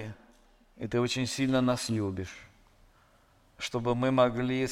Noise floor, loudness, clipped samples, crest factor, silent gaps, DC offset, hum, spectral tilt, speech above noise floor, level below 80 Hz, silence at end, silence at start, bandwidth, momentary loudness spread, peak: -63 dBFS; -29 LUFS; under 0.1%; 20 dB; none; under 0.1%; none; -5.5 dB/octave; 34 dB; -58 dBFS; 0 s; 0 s; 15 kHz; 17 LU; -10 dBFS